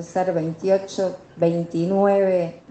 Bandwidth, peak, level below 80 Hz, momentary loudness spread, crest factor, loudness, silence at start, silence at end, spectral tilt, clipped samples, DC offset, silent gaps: 8.6 kHz; -6 dBFS; -64 dBFS; 8 LU; 14 dB; -22 LUFS; 0 s; 0.1 s; -7 dB/octave; under 0.1%; under 0.1%; none